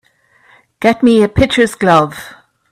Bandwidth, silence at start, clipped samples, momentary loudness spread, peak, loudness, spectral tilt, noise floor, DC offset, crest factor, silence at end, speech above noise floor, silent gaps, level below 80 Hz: 14 kHz; 0.8 s; under 0.1%; 8 LU; 0 dBFS; -12 LUFS; -5.5 dB/octave; -51 dBFS; under 0.1%; 14 dB; 0.4 s; 40 dB; none; -36 dBFS